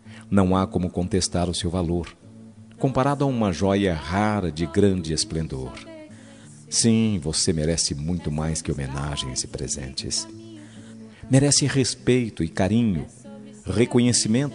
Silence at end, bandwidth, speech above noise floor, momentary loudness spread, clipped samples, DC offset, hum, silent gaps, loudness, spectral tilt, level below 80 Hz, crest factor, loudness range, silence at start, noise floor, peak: 0 s; 11 kHz; 22 dB; 20 LU; under 0.1%; under 0.1%; none; none; -23 LUFS; -4.5 dB/octave; -44 dBFS; 18 dB; 3 LU; 0.05 s; -45 dBFS; -4 dBFS